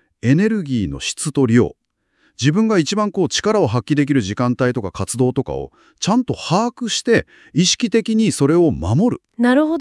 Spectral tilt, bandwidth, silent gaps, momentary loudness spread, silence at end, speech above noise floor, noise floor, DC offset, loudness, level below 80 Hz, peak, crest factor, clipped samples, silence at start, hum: -5 dB/octave; 12 kHz; none; 8 LU; 0 s; 45 dB; -62 dBFS; under 0.1%; -17 LUFS; -46 dBFS; -2 dBFS; 16 dB; under 0.1%; 0.25 s; none